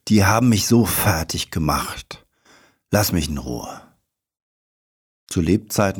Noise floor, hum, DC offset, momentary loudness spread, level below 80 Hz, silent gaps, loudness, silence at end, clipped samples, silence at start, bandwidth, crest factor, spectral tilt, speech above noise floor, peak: -65 dBFS; none; under 0.1%; 16 LU; -40 dBFS; 4.42-5.27 s; -19 LUFS; 0 s; under 0.1%; 0.05 s; 19.5 kHz; 18 dB; -5 dB/octave; 46 dB; -4 dBFS